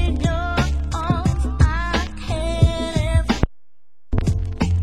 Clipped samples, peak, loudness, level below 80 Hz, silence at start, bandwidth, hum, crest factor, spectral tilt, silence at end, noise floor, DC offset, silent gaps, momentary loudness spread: under 0.1%; 0 dBFS; -21 LUFS; -24 dBFS; 0 s; 12 kHz; none; 20 dB; -6.5 dB/octave; 0 s; -75 dBFS; 2%; none; 5 LU